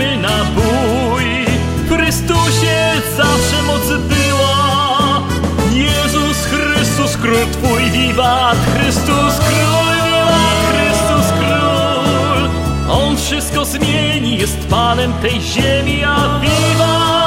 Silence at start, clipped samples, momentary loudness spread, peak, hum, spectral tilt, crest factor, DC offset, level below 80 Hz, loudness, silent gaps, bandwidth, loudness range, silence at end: 0 s; under 0.1%; 3 LU; 0 dBFS; none; -4.5 dB/octave; 12 dB; under 0.1%; -26 dBFS; -13 LUFS; none; 16 kHz; 2 LU; 0 s